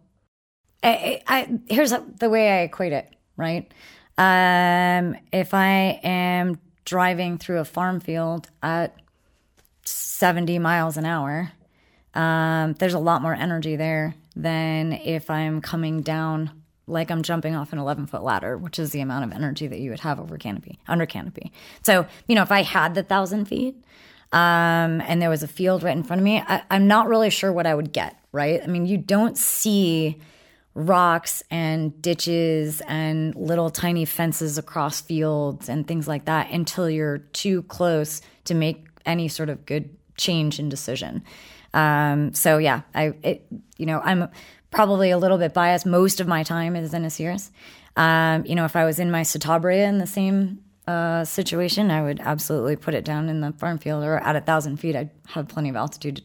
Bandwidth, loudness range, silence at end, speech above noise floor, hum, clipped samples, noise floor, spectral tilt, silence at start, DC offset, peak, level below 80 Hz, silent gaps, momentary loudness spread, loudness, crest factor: 19.5 kHz; 6 LU; 0.05 s; 41 dB; none; under 0.1%; -64 dBFS; -5 dB/octave; 0.8 s; under 0.1%; -4 dBFS; -60 dBFS; none; 11 LU; -22 LUFS; 18 dB